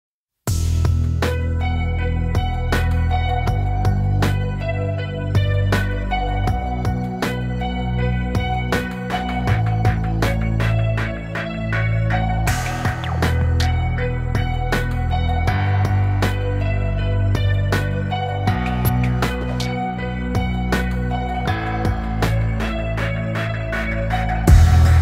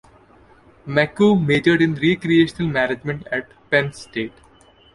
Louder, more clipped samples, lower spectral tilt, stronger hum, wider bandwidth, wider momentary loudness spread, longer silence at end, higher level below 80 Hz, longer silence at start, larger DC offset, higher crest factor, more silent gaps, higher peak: about the same, -21 LUFS vs -19 LUFS; neither; about the same, -6.5 dB/octave vs -6.5 dB/octave; neither; first, 16 kHz vs 11.5 kHz; second, 4 LU vs 12 LU; second, 0 s vs 0.65 s; first, -24 dBFS vs -52 dBFS; second, 0.45 s vs 0.85 s; neither; about the same, 18 dB vs 18 dB; neither; about the same, 0 dBFS vs -2 dBFS